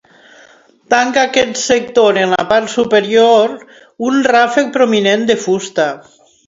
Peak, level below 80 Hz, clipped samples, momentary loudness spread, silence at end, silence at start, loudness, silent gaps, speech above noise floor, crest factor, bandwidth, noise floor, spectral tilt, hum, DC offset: 0 dBFS; -56 dBFS; under 0.1%; 7 LU; 0.45 s; 0.9 s; -12 LUFS; none; 33 dB; 14 dB; 7.8 kHz; -45 dBFS; -3.5 dB/octave; none; under 0.1%